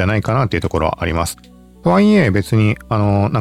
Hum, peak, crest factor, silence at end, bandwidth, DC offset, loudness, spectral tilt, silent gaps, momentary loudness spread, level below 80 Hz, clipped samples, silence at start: none; -2 dBFS; 14 dB; 0 s; 14.5 kHz; under 0.1%; -16 LUFS; -7 dB/octave; none; 9 LU; -38 dBFS; under 0.1%; 0 s